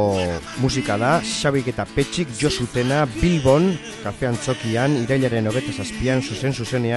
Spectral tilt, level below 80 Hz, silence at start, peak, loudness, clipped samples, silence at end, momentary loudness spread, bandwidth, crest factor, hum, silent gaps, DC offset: -5.5 dB/octave; -40 dBFS; 0 s; -4 dBFS; -21 LUFS; under 0.1%; 0 s; 6 LU; 12 kHz; 18 dB; none; none; under 0.1%